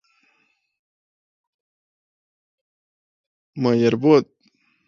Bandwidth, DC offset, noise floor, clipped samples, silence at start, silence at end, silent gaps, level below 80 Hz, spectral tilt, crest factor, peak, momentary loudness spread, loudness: 7.2 kHz; under 0.1%; -67 dBFS; under 0.1%; 3.55 s; 0.65 s; none; -70 dBFS; -7.5 dB/octave; 22 dB; -2 dBFS; 23 LU; -18 LUFS